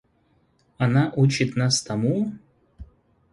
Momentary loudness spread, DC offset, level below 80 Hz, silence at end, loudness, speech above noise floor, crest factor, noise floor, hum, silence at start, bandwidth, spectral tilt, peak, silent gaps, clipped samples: 6 LU; under 0.1%; -54 dBFS; 0.5 s; -22 LUFS; 43 dB; 18 dB; -64 dBFS; none; 0.8 s; 11.5 kHz; -5.5 dB/octave; -8 dBFS; none; under 0.1%